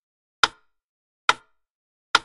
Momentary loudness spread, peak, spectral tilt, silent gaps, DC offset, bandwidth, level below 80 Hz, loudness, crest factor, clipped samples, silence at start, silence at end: 2 LU; -2 dBFS; 0 dB/octave; 0.84-1.28 s, 1.71-2.14 s; under 0.1%; 11.5 kHz; -62 dBFS; -24 LUFS; 26 dB; under 0.1%; 0.45 s; 0.05 s